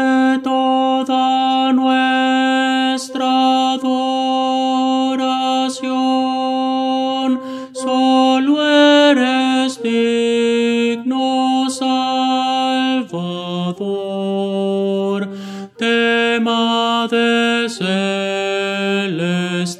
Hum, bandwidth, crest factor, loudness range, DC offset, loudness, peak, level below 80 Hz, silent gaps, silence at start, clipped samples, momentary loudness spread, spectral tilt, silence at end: none; 11.5 kHz; 14 dB; 4 LU; under 0.1%; -16 LUFS; -2 dBFS; -70 dBFS; none; 0 s; under 0.1%; 7 LU; -4.5 dB/octave; 0 s